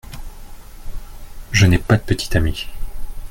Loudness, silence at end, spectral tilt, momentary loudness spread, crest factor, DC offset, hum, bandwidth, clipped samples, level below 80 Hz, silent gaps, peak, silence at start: -18 LUFS; 0 s; -5.5 dB/octave; 24 LU; 18 dB; under 0.1%; none; 17 kHz; under 0.1%; -28 dBFS; none; -2 dBFS; 0.05 s